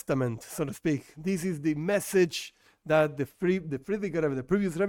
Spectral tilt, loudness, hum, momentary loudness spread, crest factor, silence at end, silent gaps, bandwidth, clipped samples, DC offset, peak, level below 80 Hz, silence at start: -6 dB/octave; -29 LUFS; none; 8 LU; 18 dB; 0 s; none; 17.5 kHz; under 0.1%; under 0.1%; -12 dBFS; -58 dBFS; 0.1 s